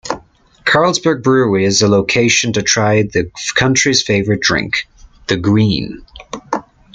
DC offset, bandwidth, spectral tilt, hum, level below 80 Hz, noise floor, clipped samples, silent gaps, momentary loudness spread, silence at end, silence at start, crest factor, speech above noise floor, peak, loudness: under 0.1%; 9.4 kHz; -4 dB/octave; none; -44 dBFS; -44 dBFS; under 0.1%; none; 14 LU; 0.35 s; 0.05 s; 14 dB; 30 dB; 0 dBFS; -14 LUFS